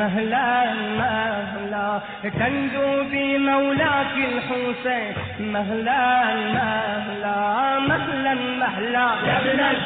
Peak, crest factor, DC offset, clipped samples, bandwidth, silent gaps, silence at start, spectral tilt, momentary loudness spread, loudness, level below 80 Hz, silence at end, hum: -8 dBFS; 14 dB; under 0.1%; under 0.1%; 4.5 kHz; none; 0 s; -9 dB/octave; 7 LU; -22 LUFS; -54 dBFS; 0 s; none